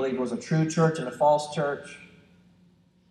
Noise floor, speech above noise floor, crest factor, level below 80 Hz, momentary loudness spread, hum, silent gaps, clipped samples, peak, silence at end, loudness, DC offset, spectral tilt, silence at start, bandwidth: -61 dBFS; 35 dB; 18 dB; -68 dBFS; 15 LU; none; none; under 0.1%; -10 dBFS; 1.05 s; -26 LUFS; under 0.1%; -6.5 dB/octave; 0 s; 11 kHz